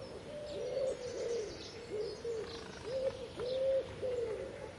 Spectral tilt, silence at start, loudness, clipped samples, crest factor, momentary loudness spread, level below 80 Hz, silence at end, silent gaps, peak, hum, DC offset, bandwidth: -4.5 dB/octave; 0 s; -40 LUFS; under 0.1%; 14 dB; 10 LU; -62 dBFS; 0 s; none; -26 dBFS; none; under 0.1%; 11.5 kHz